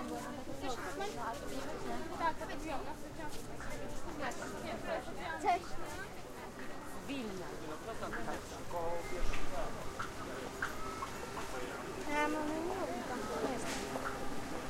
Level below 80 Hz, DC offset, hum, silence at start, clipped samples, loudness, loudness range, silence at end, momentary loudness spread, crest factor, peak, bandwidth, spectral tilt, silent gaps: -48 dBFS; under 0.1%; none; 0 s; under 0.1%; -41 LUFS; 4 LU; 0 s; 8 LU; 18 dB; -20 dBFS; 16 kHz; -4 dB/octave; none